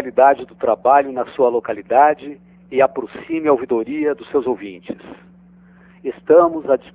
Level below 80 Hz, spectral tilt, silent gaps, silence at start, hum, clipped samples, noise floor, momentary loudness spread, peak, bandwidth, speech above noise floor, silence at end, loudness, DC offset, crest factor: -58 dBFS; -9.5 dB/octave; none; 0 s; none; under 0.1%; -47 dBFS; 16 LU; 0 dBFS; 4 kHz; 30 dB; 0.15 s; -17 LUFS; under 0.1%; 18 dB